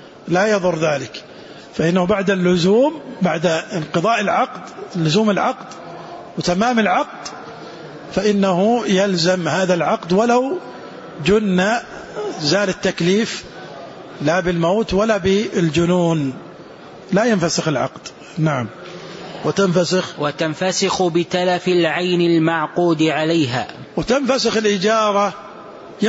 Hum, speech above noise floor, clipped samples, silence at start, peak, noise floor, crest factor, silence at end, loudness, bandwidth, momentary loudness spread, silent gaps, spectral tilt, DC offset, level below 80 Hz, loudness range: none; 21 dB; under 0.1%; 0 s; -4 dBFS; -38 dBFS; 14 dB; 0 s; -18 LUFS; 8 kHz; 18 LU; none; -5 dB/octave; under 0.1%; -50 dBFS; 3 LU